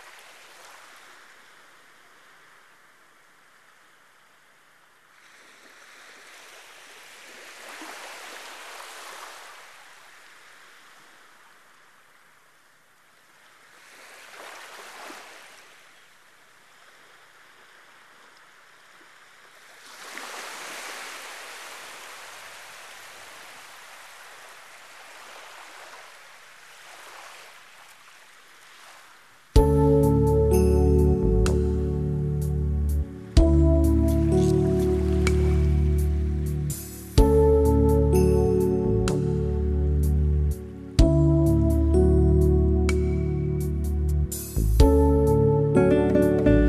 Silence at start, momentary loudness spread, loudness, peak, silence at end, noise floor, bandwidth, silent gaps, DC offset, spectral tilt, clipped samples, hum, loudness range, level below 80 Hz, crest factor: 7.35 s; 25 LU; -22 LUFS; -4 dBFS; 0 s; -59 dBFS; 14 kHz; none; under 0.1%; -7.5 dB/octave; under 0.1%; none; 23 LU; -28 dBFS; 20 dB